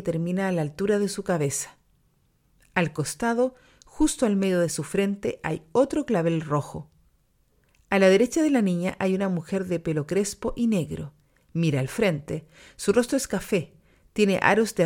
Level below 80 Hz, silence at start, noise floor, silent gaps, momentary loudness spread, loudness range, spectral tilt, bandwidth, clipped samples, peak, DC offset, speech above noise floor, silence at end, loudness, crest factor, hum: -50 dBFS; 0 s; -66 dBFS; none; 10 LU; 4 LU; -5.5 dB/octave; 17 kHz; under 0.1%; -4 dBFS; under 0.1%; 41 dB; 0 s; -25 LUFS; 22 dB; none